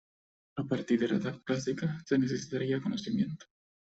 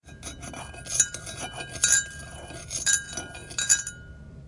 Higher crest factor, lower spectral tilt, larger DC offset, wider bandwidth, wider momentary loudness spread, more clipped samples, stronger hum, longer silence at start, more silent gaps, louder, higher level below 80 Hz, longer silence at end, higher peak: second, 16 dB vs 24 dB; first, -6.5 dB/octave vs 0 dB/octave; neither; second, 8 kHz vs 12 kHz; second, 6 LU vs 19 LU; neither; neither; first, 0.55 s vs 0.05 s; neither; second, -32 LUFS vs -25 LUFS; second, -68 dBFS vs -50 dBFS; first, 0.5 s vs 0 s; second, -16 dBFS vs -4 dBFS